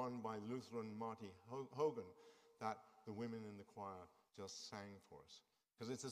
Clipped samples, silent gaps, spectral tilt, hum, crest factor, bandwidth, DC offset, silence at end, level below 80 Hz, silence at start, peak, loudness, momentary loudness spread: under 0.1%; none; -5 dB/octave; none; 20 dB; 15.5 kHz; under 0.1%; 0 s; -88 dBFS; 0 s; -30 dBFS; -50 LUFS; 18 LU